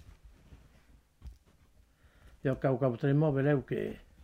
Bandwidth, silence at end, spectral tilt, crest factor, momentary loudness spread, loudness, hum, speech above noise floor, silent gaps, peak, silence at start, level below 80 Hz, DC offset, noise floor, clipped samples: 4.9 kHz; 0.25 s; -9.5 dB/octave; 18 dB; 9 LU; -31 LUFS; none; 34 dB; none; -16 dBFS; 0.5 s; -58 dBFS; under 0.1%; -64 dBFS; under 0.1%